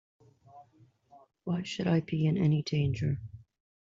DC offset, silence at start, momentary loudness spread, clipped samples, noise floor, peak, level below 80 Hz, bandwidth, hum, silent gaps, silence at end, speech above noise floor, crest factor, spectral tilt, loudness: under 0.1%; 0.55 s; 11 LU; under 0.1%; -63 dBFS; -18 dBFS; -60 dBFS; 7.6 kHz; none; none; 0.55 s; 34 dB; 16 dB; -7 dB/octave; -30 LUFS